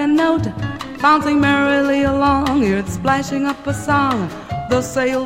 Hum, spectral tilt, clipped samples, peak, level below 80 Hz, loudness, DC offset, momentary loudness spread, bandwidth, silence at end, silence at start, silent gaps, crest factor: none; -5.5 dB/octave; under 0.1%; 0 dBFS; -38 dBFS; -17 LUFS; under 0.1%; 9 LU; 16 kHz; 0 s; 0 s; none; 16 dB